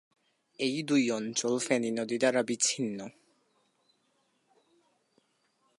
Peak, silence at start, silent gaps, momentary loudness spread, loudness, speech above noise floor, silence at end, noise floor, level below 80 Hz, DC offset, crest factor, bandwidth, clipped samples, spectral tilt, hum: -12 dBFS; 0.6 s; none; 7 LU; -29 LUFS; 44 dB; 2.7 s; -74 dBFS; -82 dBFS; under 0.1%; 20 dB; 11.5 kHz; under 0.1%; -3 dB/octave; none